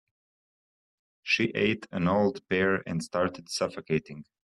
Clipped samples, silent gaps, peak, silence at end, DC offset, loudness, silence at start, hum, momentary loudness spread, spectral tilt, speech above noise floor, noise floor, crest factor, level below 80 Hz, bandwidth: under 0.1%; none; -12 dBFS; 0.2 s; under 0.1%; -28 LUFS; 1.25 s; none; 6 LU; -5 dB/octave; over 62 dB; under -90 dBFS; 18 dB; -64 dBFS; 12.5 kHz